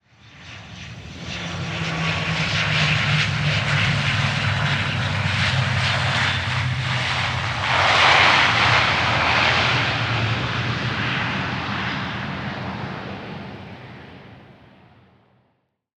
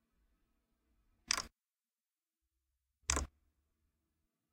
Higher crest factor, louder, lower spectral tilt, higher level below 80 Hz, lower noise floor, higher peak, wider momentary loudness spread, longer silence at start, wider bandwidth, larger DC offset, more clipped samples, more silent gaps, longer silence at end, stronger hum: second, 20 dB vs 34 dB; first, -19 LUFS vs -38 LUFS; first, -4 dB/octave vs -1.5 dB/octave; first, -46 dBFS vs -54 dBFS; second, -68 dBFS vs under -90 dBFS; first, -2 dBFS vs -12 dBFS; first, 20 LU vs 13 LU; second, 0.25 s vs 1.3 s; second, 10.5 kHz vs 16 kHz; neither; neither; neither; first, 1.5 s vs 1.25 s; neither